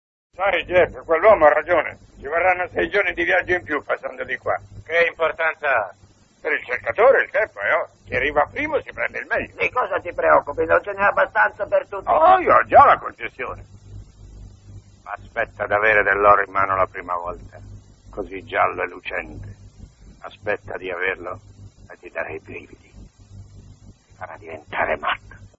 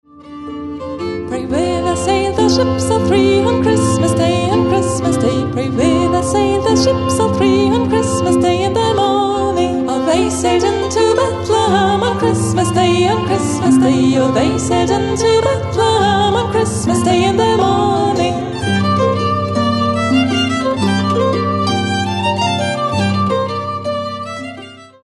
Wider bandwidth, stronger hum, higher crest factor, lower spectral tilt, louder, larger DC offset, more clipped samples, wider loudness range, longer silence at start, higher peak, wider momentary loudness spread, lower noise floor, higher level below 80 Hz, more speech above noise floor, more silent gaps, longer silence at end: second, 7.8 kHz vs 11.5 kHz; neither; first, 20 dB vs 12 dB; about the same, -6 dB/octave vs -5.5 dB/octave; second, -19 LUFS vs -14 LUFS; neither; neither; first, 13 LU vs 2 LU; first, 0.4 s vs 0.15 s; about the same, 0 dBFS vs -2 dBFS; first, 18 LU vs 6 LU; first, -47 dBFS vs -34 dBFS; second, -48 dBFS vs -40 dBFS; first, 27 dB vs 22 dB; neither; about the same, 0.1 s vs 0.2 s